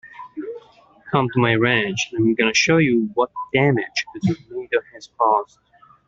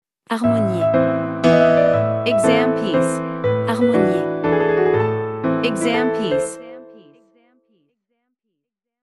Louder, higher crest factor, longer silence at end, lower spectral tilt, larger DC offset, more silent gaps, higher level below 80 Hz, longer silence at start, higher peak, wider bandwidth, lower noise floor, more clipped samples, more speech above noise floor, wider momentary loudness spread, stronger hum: about the same, -19 LUFS vs -18 LUFS; about the same, 18 dB vs 18 dB; second, 0.65 s vs 2.1 s; about the same, -5 dB/octave vs -6 dB/octave; neither; neither; about the same, -56 dBFS vs -54 dBFS; second, 0.05 s vs 0.3 s; about the same, -2 dBFS vs 0 dBFS; second, 7.6 kHz vs 12 kHz; second, -50 dBFS vs -80 dBFS; neither; second, 30 dB vs 63 dB; first, 17 LU vs 7 LU; neither